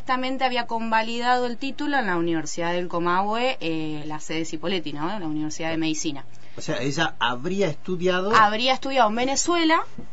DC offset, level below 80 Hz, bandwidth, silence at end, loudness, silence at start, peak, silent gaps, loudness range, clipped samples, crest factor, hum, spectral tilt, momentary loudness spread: 4%; -56 dBFS; 8 kHz; 0.05 s; -24 LUFS; 0 s; -4 dBFS; none; 6 LU; under 0.1%; 20 dB; none; -3.5 dB/octave; 10 LU